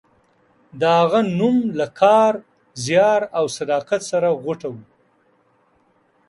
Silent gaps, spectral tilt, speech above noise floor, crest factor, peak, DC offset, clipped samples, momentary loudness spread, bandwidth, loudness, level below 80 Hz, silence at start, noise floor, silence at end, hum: none; -5.5 dB/octave; 43 dB; 18 dB; -2 dBFS; under 0.1%; under 0.1%; 14 LU; 11.5 kHz; -19 LUFS; -64 dBFS; 0.75 s; -61 dBFS; 1.5 s; none